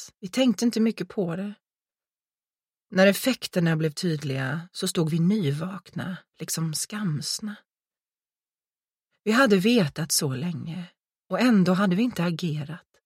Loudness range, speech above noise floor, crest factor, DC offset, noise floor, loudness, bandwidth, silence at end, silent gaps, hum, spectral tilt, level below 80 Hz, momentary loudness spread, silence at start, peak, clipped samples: 7 LU; over 65 dB; 22 dB; under 0.1%; under -90 dBFS; -25 LUFS; 16 kHz; 0.25 s; none; none; -5 dB/octave; -68 dBFS; 14 LU; 0 s; -4 dBFS; under 0.1%